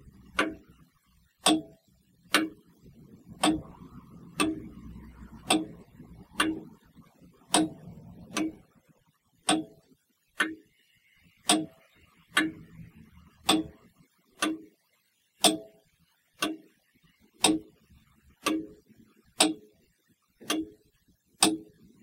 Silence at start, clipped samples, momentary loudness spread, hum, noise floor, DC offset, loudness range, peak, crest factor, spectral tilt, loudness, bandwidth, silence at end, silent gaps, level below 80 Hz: 0.35 s; under 0.1%; 23 LU; none; -72 dBFS; under 0.1%; 2 LU; -4 dBFS; 28 dB; -2 dB/octave; -29 LUFS; 16 kHz; 0.4 s; none; -60 dBFS